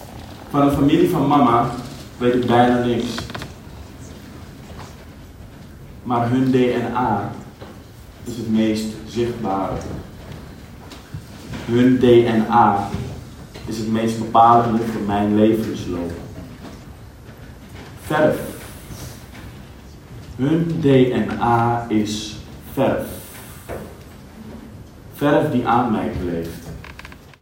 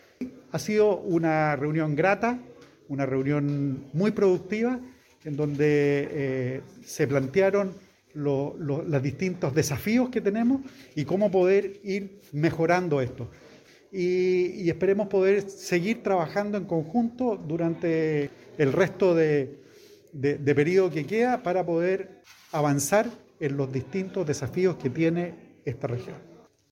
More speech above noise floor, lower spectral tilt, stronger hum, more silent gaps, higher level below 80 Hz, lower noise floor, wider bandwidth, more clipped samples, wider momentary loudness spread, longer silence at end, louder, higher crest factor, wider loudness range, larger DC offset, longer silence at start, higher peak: second, 22 dB vs 27 dB; about the same, -7 dB/octave vs -6.5 dB/octave; neither; neither; first, -44 dBFS vs -62 dBFS; second, -40 dBFS vs -53 dBFS; about the same, 17 kHz vs 16.5 kHz; neither; first, 24 LU vs 12 LU; second, 0.25 s vs 0.5 s; first, -18 LUFS vs -26 LUFS; about the same, 18 dB vs 18 dB; first, 9 LU vs 2 LU; neither; second, 0 s vs 0.2 s; first, -2 dBFS vs -8 dBFS